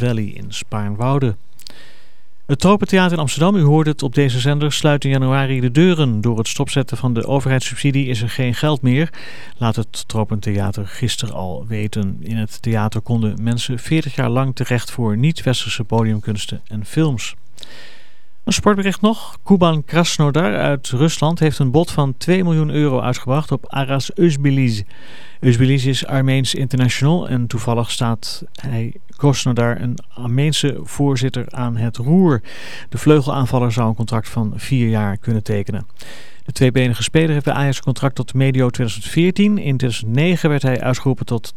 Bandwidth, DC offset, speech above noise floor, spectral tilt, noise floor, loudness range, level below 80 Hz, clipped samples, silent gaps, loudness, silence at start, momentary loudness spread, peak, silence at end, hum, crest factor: 14 kHz; 5%; 39 dB; -6 dB/octave; -56 dBFS; 4 LU; -46 dBFS; under 0.1%; none; -18 LUFS; 0 s; 10 LU; 0 dBFS; 0.05 s; none; 16 dB